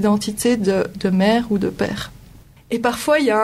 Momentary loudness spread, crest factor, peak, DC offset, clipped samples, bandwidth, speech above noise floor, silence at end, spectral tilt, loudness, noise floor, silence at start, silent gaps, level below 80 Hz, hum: 9 LU; 14 dB; -4 dBFS; under 0.1%; under 0.1%; 15.5 kHz; 27 dB; 0 s; -5.5 dB/octave; -19 LUFS; -45 dBFS; 0 s; none; -46 dBFS; none